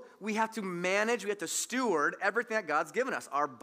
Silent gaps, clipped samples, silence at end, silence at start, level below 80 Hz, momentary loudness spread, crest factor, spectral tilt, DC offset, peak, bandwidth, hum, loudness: none; under 0.1%; 0.05 s; 0 s; under -90 dBFS; 5 LU; 18 dB; -3 dB/octave; under 0.1%; -14 dBFS; 16 kHz; none; -31 LUFS